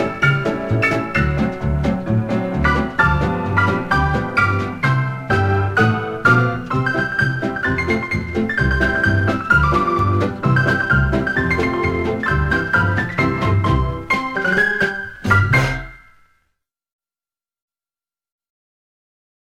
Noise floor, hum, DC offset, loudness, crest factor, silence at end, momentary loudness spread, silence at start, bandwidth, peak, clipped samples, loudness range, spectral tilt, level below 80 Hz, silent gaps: under -90 dBFS; none; under 0.1%; -17 LUFS; 16 dB; 3.45 s; 5 LU; 0 s; 13 kHz; -2 dBFS; under 0.1%; 3 LU; -7 dB/octave; -30 dBFS; none